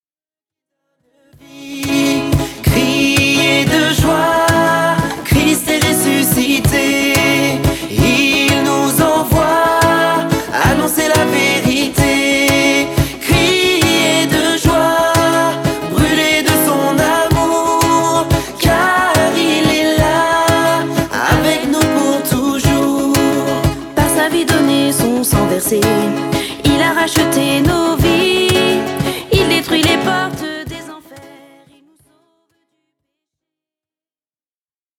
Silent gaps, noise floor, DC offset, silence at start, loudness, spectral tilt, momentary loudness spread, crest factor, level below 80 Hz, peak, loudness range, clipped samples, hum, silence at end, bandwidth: none; under -90 dBFS; under 0.1%; 1.55 s; -13 LUFS; -4 dB/octave; 5 LU; 12 dB; -32 dBFS; 0 dBFS; 3 LU; under 0.1%; none; 3.7 s; 19.5 kHz